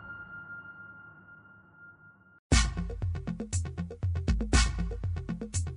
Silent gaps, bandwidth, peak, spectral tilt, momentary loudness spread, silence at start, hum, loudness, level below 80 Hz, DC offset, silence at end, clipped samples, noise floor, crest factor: 2.39-2.50 s; 11 kHz; -12 dBFS; -4.5 dB/octave; 25 LU; 0 s; none; -32 LUFS; -36 dBFS; under 0.1%; 0 s; under 0.1%; -57 dBFS; 20 dB